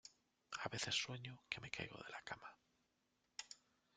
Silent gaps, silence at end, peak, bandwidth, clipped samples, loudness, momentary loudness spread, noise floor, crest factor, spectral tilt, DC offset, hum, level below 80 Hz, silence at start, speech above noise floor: none; 0.4 s; -24 dBFS; 10 kHz; under 0.1%; -47 LUFS; 18 LU; -85 dBFS; 28 dB; -2 dB/octave; under 0.1%; none; -78 dBFS; 0.05 s; 36 dB